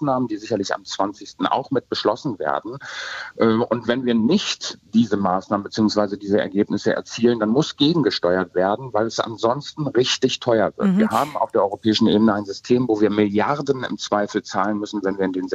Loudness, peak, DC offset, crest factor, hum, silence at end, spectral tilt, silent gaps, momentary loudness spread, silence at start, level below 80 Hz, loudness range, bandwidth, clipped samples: -21 LUFS; -4 dBFS; under 0.1%; 16 dB; none; 0 s; -5.5 dB/octave; none; 7 LU; 0 s; -60 dBFS; 3 LU; 13 kHz; under 0.1%